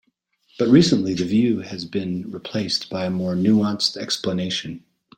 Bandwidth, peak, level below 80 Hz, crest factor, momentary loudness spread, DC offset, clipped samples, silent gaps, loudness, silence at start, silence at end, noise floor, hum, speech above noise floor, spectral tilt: 16.5 kHz; -2 dBFS; -56 dBFS; 20 dB; 13 LU; under 0.1%; under 0.1%; none; -21 LUFS; 0.6 s; 0.4 s; -66 dBFS; none; 45 dB; -5.5 dB/octave